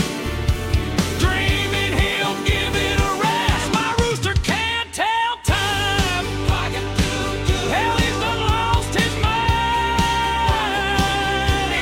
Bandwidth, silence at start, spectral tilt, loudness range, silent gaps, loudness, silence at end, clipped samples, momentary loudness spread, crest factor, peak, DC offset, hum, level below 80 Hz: 16.5 kHz; 0 s; -4 dB/octave; 1 LU; none; -19 LUFS; 0 s; under 0.1%; 3 LU; 12 dB; -6 dBFS; under 0.1%; none; -28 dBFS